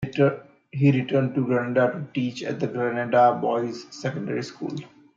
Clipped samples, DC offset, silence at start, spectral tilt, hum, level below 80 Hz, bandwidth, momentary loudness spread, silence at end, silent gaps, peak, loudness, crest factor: under 0.1%; under 0.1%; 0 s; -7.5 dB/octave; none; -64 dBFS; 7.6 kHz; 13 LU; 0.3 s; none; -6 dBFS; -24 LUFS; 18 dB